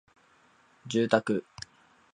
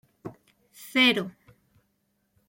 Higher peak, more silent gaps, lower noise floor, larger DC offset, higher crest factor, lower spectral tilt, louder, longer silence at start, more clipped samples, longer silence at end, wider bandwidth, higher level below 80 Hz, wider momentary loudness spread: first, -6 dBFS vs -10 dBFS; neither; second, -63 dBFS vs -74 dBFS; neither; about the same, 26 dB vs 22 dB; first, -5.5 dB/octave vs -3.5 dB/octave; second, -28 LUFS vs -23 LUFS; first, 0.85 s vs 0.25 s; neither; second, 0.75 s vs 1.2 s; second, 10.5 kHz vs 16.5 kHz; about the same, -70 dBFS vs -72 dBFS; second, 20 LU vs 24 LU